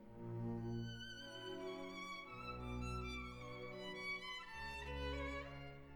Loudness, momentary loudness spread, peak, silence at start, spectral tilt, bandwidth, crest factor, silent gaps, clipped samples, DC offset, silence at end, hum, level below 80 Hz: -48 LUFS; 6 LU; -34 dBFS; 0 s; -5.5 dB/octave; 19 kHz; 14 dB; none; under 0.1%; under 0.1%; 0 s; none; -56 dBFS